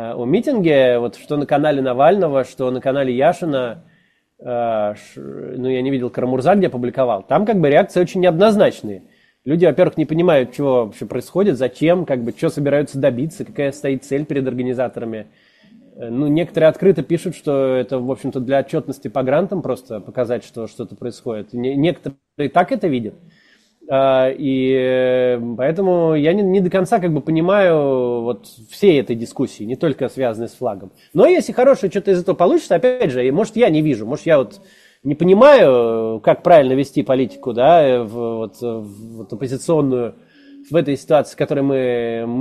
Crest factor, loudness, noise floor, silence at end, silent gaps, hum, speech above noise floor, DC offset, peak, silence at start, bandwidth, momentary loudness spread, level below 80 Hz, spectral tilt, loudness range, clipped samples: 16 dB; -17 LUFS; -56 dBFS; 0 s; none; none; 39 dB; under 0.1%; 0 dBFS; 0 s; 13.5 kHz; 13 LU; -56 dBFS; -7 dB/octave; 7 LU; under 0.1%